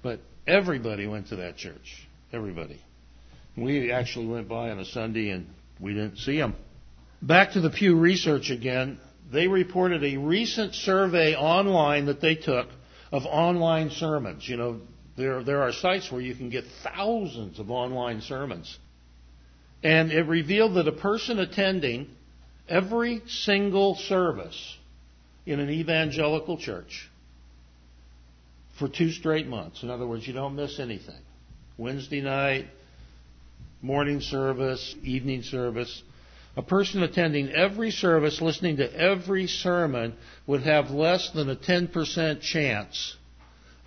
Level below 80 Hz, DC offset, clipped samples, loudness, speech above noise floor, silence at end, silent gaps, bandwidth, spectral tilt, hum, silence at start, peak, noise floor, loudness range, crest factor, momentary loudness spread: -52 dBFS; under 0.1%; under 0.1%; -26 LUFS; 27 dB; 0.7 s; none; 6.6 kHz; -5.5 dB/octave; none; 0.05 s; -4 dBFS; -53 dBFS; 9 LU; 24 dB; 15 LU